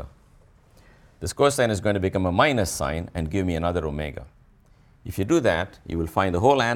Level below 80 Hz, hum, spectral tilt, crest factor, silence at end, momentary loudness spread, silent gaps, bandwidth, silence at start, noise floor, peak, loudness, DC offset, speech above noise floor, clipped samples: -42 dBFS; none; -5 dB/octave; 20 dB; 0 s; 14 LU; none; 17.5 kHz; 0 s; -55 dBFS; -4 dBFS; -24 LUFS; under 0.1%; 32 dB; under 0.1%